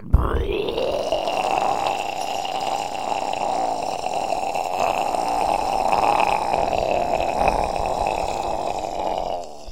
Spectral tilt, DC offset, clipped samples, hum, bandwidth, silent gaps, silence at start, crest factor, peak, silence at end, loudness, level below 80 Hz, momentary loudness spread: -4.5 dB/octave; 1%; under 0.1%; none; 16.5 kHz; none; 0 s; 20 dB; -2 dBFS; 0 s; -23 LUFS; -32 dBFS; 5 LU